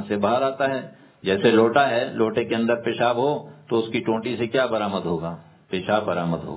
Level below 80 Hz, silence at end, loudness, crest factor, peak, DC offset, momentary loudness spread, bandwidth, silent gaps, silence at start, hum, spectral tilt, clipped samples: -56 dBFS; 0 s; -23 LUFS; 20 dB; -4 dBFS; under 0.1%; 12 LU; 4 kHz; none; 0 s; none; -10 dB/octave; under 0.1%